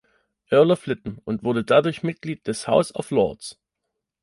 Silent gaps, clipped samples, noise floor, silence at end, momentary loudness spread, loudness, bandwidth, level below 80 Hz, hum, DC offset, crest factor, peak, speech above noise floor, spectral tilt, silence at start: none; under 0.1%; -81 dBFS; 0.7 s; 12 LU; -22 LUFS; 11.5 kHz; -58 dBFS; none; under 0.1%; 18 dB; -4 dBFS; 60 dB; -6 dB/octave; 0.5 s